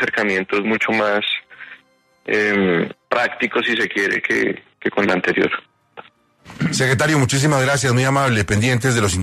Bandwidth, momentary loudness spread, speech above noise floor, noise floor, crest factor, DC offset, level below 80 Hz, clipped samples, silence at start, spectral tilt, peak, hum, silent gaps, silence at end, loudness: 13.5 kHz; 7 LU; 38 dB; -55 dBFS; 16 dB; under 0.1%; -48 dBFS; under 0.1%; 0 s; -4.5 dB/octave; -4 dBFS; none; none; 0 s; -18 LUFS